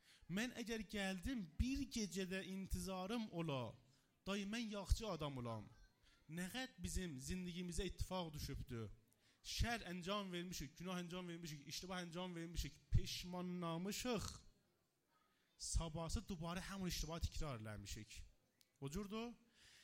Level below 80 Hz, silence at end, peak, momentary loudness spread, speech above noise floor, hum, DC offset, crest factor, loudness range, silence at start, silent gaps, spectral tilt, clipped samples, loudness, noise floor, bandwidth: -54 dBFS; 0 s; -24 dBFS; 9 LU; 37 dB; none; under 0.1%; 22 dB; 3 LU; 0.05 s; none; -4.5 dB/octave; under 0.1%; -47 LUFS; -83 dBFS; 16 kHz